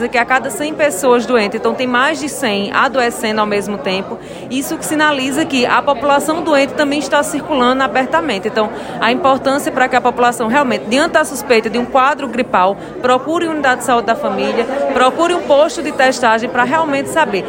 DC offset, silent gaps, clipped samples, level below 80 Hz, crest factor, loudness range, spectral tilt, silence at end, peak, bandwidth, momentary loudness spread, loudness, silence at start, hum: under 0.1%; none; under 0.1%; -48 dBFS; 14 dB; 2 LU; -3.5 dB/octave; 0 s; 0 dBFS; 16.5 kHz; 6 LU; -14 LUFS; 0 s; none